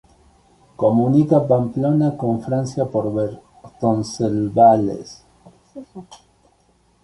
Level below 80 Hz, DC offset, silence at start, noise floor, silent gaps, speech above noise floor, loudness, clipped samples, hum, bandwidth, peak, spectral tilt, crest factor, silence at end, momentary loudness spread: -54 dBFS; under 0.1%; 0.8 s; -59 dBFS; none; 41 dB; -18 LUFS; under 0.1%; none; 11.5 kHz; -2 dBFS; -8.5 dB/octave; 18 dB; 0.9 s; 20 LU